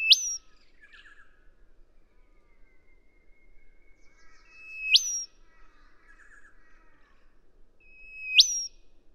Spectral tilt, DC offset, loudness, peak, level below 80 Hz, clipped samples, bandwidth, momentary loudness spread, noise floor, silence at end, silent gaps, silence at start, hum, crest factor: 5 dB/octave; under 0.1%; -23 LUFS; -6 dBFS; -58 dBFS; under 0.1%; 17.5 kHz; 24 LU; -57 dBFS; 0.25 s; none; 0 s; none; 26 dB